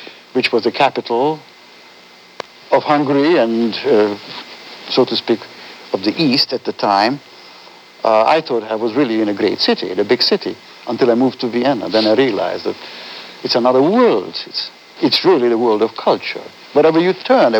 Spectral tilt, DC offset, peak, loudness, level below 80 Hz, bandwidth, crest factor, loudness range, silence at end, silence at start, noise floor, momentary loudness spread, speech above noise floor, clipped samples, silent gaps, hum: -5.5 dB/octave; under 0.1%; 0 dBFS; -15 LUFS; -74 dBFS; 19.5 kHz; 16 dB; 2 LU; 0 s; 0 s; -43 dBFS; 15 LU; 28 dB; under 0.1%; none; none